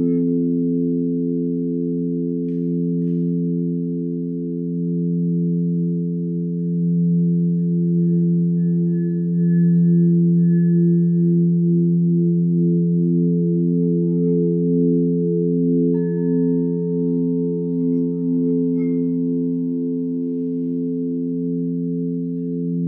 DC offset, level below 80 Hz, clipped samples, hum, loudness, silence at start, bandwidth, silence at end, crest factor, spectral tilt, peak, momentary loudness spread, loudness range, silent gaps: under 0.1%; -66 dBFS; under 0.1%; none; -19 LUFS; 0 s; 1.8 kHz; 0 s; 10 dB; -15.5 dB/octave; -8 dBFS; 7 LU; 6 LU; none